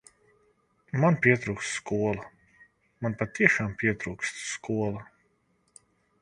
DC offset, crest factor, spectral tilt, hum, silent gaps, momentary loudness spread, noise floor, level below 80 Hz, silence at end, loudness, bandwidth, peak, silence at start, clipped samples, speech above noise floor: under 0.1%; 28 dB; -5.5 dB/octave; none; none; 12 LU; -70 dBFS; -58 dBFS; 1.2 s; -27 LUFS; 11 kHz; -2 dBFS; 0.95 s; under 0.1%; 43 dB